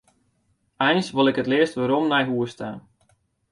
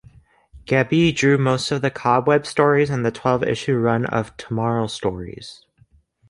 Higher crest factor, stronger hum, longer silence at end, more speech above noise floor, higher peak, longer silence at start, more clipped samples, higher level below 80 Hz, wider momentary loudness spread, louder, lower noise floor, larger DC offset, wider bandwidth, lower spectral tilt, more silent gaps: about the same, 18 dB vs 18 dB; neither; about the same, 0.75 s vs 0.75 s; first, 47 dB vs 37 dB; second, -6 dBFS vs -2 dBFS; first, 0.8 s vs 0.55 s; neither; second, -64 dBFS vs -50 dBFS; first, 14 LU vs 10 LU; about the same, -22 LUFS vs -20 LUFS; first, -68 dBFS vs -57 dBFS; neither; about the same, 11 kHz vs 11.5 kHz; about the same, -5.5 dB/octave vs -6 dB/octave; neither